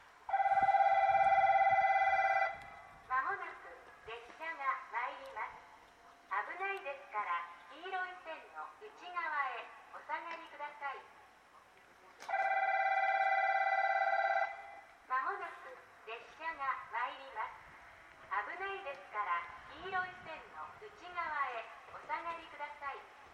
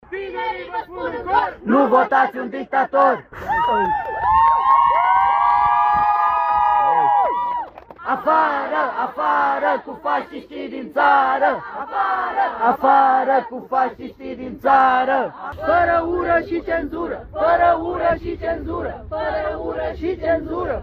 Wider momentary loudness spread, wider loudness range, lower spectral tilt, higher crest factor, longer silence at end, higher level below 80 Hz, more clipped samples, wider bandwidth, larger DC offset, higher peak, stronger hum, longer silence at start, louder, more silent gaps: first, 21 LU vs 12 LU; first, 10 LU vs 5 LU; second, -3 dB/octave vs -7 dB/octave; about the same, 18 dB vs 16 dB; about the same, 0 s vs 0 s; second, -74 dBFS vs -44 dBFS; neither; first, 9 kHz vs 6.2 kHz; neither; second, -20 dBFS vs -4 dBFS; neither; about the same, 0 s vs 0.1 s; second, -36 LUFS vs -18 LUFS; neither